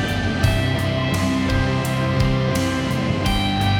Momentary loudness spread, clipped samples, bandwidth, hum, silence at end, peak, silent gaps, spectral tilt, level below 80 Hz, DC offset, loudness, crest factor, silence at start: 2 LU; under 0.1%; 19.5 kHz; none; 0 s; -4 dBFS; none; -5.5 dB/octave; -30 dBFS; under 0.1%; -20 LUFS; 16 dB; 0 s